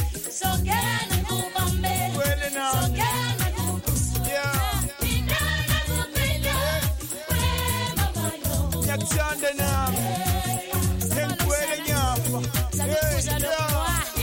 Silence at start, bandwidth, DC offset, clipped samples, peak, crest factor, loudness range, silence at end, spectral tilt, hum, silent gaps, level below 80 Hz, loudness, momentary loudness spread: 0 s; 17 kHz; under 0.1%; under 0.1%; -10 dBFS; 14 dB; 1 LU; 0 s; -4 dB/octave; none; none; -32 dBFS; -24 LUFS; 3 LU